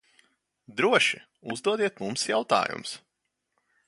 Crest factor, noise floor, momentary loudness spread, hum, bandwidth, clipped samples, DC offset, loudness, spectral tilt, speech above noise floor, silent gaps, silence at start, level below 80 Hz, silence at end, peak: 22 dB; -79 dBFS; 16 LU; none; 11.5 kHz; under 0.1%; under 0.1%; -26 LUFS; -3 dB/octave; 52 dB; none; 0.7 s; -74 dBFS; 0.9 s; -6 dBFS